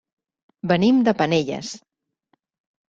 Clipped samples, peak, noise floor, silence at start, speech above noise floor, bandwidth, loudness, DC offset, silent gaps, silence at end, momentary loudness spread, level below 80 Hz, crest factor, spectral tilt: under 0.1%; -4 dBFS; -69 dBFS; 0.65 s; 50 dB; 7.8 kHz; -20 LUFS; under 0.1%; none; 1.1 s; 17 LU; -60 dBFS; 18 dB; -6 dB/octave